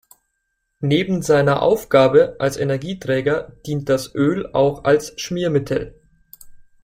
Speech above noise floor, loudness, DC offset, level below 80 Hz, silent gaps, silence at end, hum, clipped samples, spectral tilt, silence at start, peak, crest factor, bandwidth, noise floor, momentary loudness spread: 55 dB; -19 LUFS; under 0.1%; -48 dBFS; none; 0.25 s; none; under 0.1%; -6 dB/octave; 0.8 s; -2 dBFS; 18 dB; 16 kHz; -73 dBFS; 10 LU